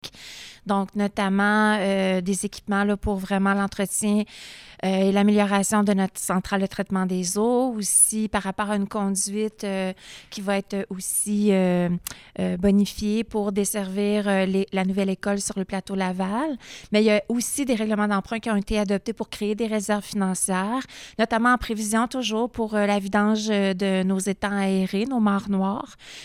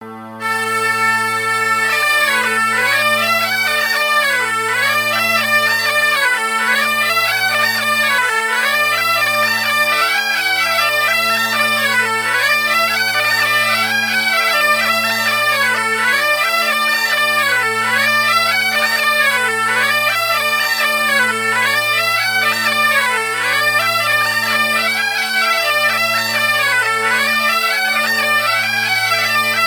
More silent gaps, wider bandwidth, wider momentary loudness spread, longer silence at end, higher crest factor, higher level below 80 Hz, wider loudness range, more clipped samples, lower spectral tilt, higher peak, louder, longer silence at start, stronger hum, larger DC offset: neither; second, 15.5 kHz vs over 20 kHz; first, 9 LU vs 2 LU; about the same, 0 s vs 0 s; about the same, 18 dB vs 14 dB; first, -50 dBFS vs -64 dBFS; about the same, 3 LU vs 1 LU; neither; first, -4.5 dB/octave vs -1 dB/octave; second, -6 dBFS vs -2 dBFS; second, -23 LUFS vs -13 LUFS; about the same, 0.05 s vs 0 s; neither; neither